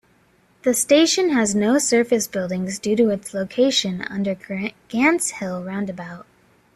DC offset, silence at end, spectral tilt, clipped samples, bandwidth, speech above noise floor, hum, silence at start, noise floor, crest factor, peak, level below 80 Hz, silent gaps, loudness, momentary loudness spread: under 0.1%; 0.55 s; -3.5 dB/octave; under 0.1%; 14.5 kHz; 38 dB; none; 0.65 s; -58 dBFS; 18 dB; -4 dBFS; -60 dBFS; none; -20 LUFS; 12 LU